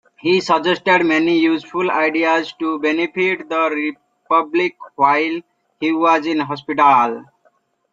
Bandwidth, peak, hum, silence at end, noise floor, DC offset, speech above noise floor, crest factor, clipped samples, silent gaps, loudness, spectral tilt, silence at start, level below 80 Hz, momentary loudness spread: 7.6 kHz; -2 dBFS; none; 0.7 s; -60 dBFS; under 0.1%; 44 dB; 16 dB; under 0.1%; none; -17 LUFS; -5 dB/octave; 0.25 s; -66 dBFS; 9 LU